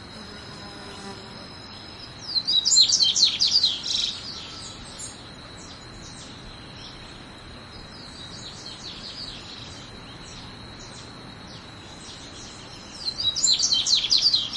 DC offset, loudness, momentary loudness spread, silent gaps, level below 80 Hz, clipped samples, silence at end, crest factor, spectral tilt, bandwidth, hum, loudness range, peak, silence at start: under 0.1%; -19 LUFS; 23 LU; none; -52 dBFS; under 0.1%; 0 s; 24 dB; 0 dB/octave; 12 kHz; none; 20 LU; -4 dBFS; 0 s